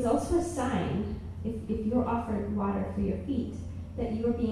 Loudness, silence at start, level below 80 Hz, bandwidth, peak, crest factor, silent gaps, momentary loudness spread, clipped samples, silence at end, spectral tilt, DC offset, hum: -31 LUFS; 0 s; -44 dBFS; 13 kHz; -16 dBFS; 14 dB; none; 8 LU; under 0.1%; 0 s; -7.5 dB/octave; under 0.1%; none